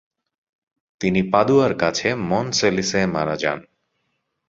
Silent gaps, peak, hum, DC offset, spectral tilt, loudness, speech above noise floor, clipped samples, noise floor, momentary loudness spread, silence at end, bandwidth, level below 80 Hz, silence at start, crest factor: none; -2 dBFS; none; under 0.1%; -4.5 dB/octave; -20 LUFS; 54 dB; under 0.1%; -73 dBFS; 7 LU; 0.85 s; 7.8 kHz; -52 dBFS; 1 s; 20 dB